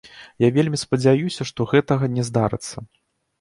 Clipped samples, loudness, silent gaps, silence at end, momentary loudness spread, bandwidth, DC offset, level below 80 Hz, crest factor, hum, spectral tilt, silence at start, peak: under 0.1%; -21 LUFS; none; 0.55 s; 10 LU; 11.5 kHz; under 0.1%; -54 dBFS; 16 dB; none; -6 dB/octave; 0.05 s; -4 dBFS